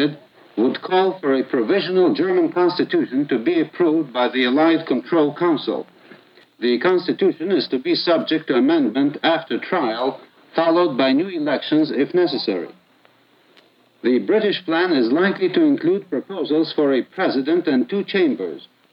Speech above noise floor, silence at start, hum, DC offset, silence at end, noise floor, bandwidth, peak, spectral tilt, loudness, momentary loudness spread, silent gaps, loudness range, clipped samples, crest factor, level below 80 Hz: 37 dB; 0 s; none; under 0.1%; 0.3 s; -56 dBFS; 5.6 kHz; -4 dBFS; -8 dB/octave; -19 LUFS; 6 LU; none; 3 LU; under 0.1%; 14 dB; -82 dBFS